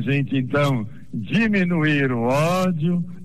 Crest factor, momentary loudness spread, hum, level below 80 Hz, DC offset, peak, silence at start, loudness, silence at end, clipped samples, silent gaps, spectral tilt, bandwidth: 10 dB; 5 LU; none; -52 dBFS; 1%; -10 dBFS; 0 s; -21 LUFS; 0 s; under 0.1%; none; -7 dB/octave; 13.5 kHz